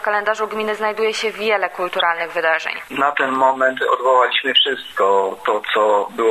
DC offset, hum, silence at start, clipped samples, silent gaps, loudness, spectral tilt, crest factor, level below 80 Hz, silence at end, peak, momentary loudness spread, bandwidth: under 0.1%; none; 0 s; under 0.1%; none; -17 LUFS; -2 dB/octave; 16 dB; -64 dBFS; 0 s; -2 dBFS; 6 LU; 13 kHz